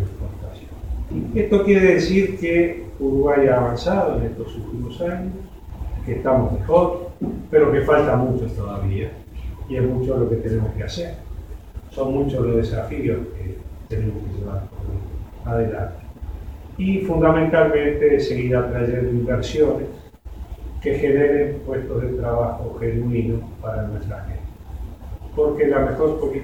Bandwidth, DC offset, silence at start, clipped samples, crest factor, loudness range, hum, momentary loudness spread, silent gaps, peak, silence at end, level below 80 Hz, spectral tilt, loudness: 16 kHz; 0.2%; 0 s; under 0.1%; 18 dB; 7 LU; none; 19 LU; none; -2 dBFS; 0 s; -34 dBFS; -8 dB/octave; -21 LUFS